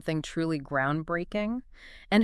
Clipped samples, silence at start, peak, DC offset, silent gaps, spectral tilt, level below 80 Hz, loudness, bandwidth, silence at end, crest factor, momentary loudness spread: under 0.1%; 0.05 s; -8 dBFS; under 0.1%; none; -6.5 dB/octave; -52 dBFS; -30 LUFS; 12 kHz; 0 s; 20 dB; 12 LU